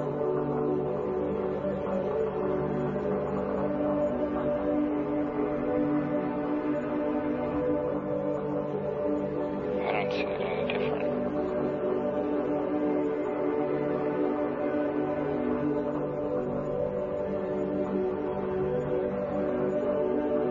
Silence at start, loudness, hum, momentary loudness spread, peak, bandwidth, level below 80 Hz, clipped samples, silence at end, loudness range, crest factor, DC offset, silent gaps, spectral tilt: 0 s; -30 LUFS; none; 3 LU; -16 dBFS; 7 kHz; -54 dBFS; under 0.1%; 0 s; 1 LU; 14 dB; under 0.1%; none; -9 dB/octave